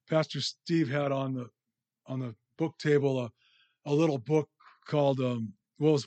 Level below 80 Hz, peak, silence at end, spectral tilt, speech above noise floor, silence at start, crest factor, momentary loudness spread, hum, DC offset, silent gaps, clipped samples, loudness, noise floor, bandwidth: -80 dBFS; -14 dBFS; 0 s; -6.5 dB/octave; 44 dB; 0.1 s; 16 dB; 14 LU; none; under 0.1%; none; under 0.1%; -30 LUFS; -73 dBFS; 8.8 kHz